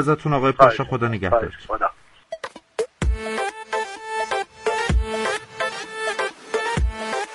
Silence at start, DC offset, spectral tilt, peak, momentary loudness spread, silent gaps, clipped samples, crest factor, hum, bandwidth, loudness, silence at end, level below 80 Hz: 0 s; under 0.1%; -5.5 dB/octave; 0 dBFS; 11 LU; none; under 0.1%; 22 dB; none; 11.5 kHz; -23 LUFS; 0 s; -32 dBFS